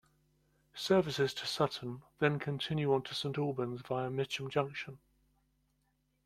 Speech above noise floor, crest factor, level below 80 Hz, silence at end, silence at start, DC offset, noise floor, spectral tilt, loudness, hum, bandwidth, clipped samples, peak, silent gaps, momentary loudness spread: 43 dB; 22 dB; -70 dBFS; 1.3 s; 0.75 s; under 0.1%; -77 dBFS; -5.5 dB/octave; -35 LUFS; none; 15 kHz; under 0.1%; -14 dBFS; none; 11 LU